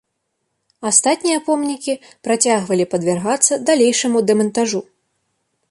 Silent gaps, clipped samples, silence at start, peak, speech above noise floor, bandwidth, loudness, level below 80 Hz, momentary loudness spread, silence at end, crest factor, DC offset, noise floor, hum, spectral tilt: none; under 0.1%; 0.8 s; 0 dBFS; 56 dB; 11.5 kHz; -17 LUFS; -66 dBFS; 9 LU; 0.9 s; 18 dB; under 0.1%; -73 dBFS; none; -3 dB/octave